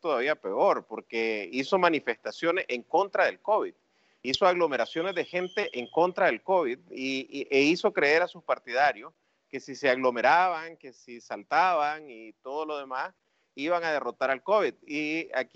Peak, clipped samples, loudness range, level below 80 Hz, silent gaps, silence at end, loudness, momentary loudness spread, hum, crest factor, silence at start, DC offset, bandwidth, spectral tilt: -8 dBFS; under 0.1%; 4 LU; -74 dBFS; none; 0.1 s; -27 LUFS; 14 LU; none; 20 dB; 0.05 s; under 0.1%; 8 kHz; -4 dB/octave